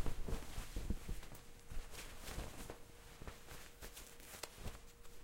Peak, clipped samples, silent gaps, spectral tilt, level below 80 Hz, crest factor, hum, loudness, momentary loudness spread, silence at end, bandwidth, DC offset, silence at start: -24 dBFS; under 0.1%; none; -4 dB/octave; -50 dBFS; 20 dB; none; -52 LUFS; 9 LU; 0 s; 16.5 kHz; under 0.1%; 0 s